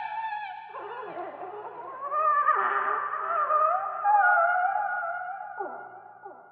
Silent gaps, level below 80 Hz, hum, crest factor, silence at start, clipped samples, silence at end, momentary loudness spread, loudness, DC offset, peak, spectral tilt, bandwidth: none; under -90 dBFS; none; 16 dB; 0 s; under 0.1%; 0.1 s; 17 LU; -26 LUFS; under 0.1%; -12 dBFS; 0 dB/octave; 4.5 kHz